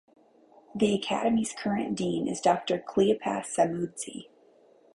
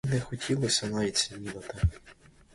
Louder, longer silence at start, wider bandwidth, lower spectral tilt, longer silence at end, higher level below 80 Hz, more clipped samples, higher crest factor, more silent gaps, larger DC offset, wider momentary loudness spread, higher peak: about the same, -28 LUFS vs -30 LUFS; first, 0.75 s vs 0.05 s; about the same, 11.5 kHz vs 11.5 kHz; about the same, -5 dB/octave vs -4 dB/octave; first, 0.75 s vs 0.4 s; second, -64 dBFS vs -42 dBFS; neither; about the same, 18 dB vs 20 dB; neither; neither; about the same, 10 LU vs 8 LU; about the same, -10 dBFS vs -12 dBFS